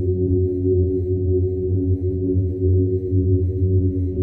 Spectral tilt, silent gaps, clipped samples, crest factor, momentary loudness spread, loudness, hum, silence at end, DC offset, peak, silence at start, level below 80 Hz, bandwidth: -15 dB/octave; none; under 0.1%; 12 dB; 3 LU; -20 LUFS; none; 0 s; under 0.1%; -8 dBFS; 0 s; -34 dBFS; 0.8 kHz